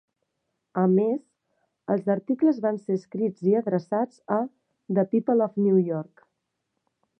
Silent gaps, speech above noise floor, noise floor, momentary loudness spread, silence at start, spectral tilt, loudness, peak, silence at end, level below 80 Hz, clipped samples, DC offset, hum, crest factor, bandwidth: none; 56 dB; -79 dBFS; 10 LU; 0.75 s; -10.5 dB/octave; -25 LUFS; -8 dBFS; 1.15 s; -80 dBFS; under 0.1%; under 0.1%; none; 18 dB; 6 kHz